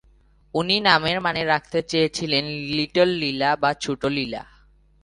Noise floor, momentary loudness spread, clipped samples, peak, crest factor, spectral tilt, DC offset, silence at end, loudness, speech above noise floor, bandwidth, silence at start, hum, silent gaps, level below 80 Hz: -56 dBFS; 9 LU; under 0.1%; 0 dBFS; 22 dB; -4.5 dB/octave; under 0.1%; 0.6 s; -22 LUFS; 34 dB; 11.5 kHz; 0.55 s; none; none; -54 dBFS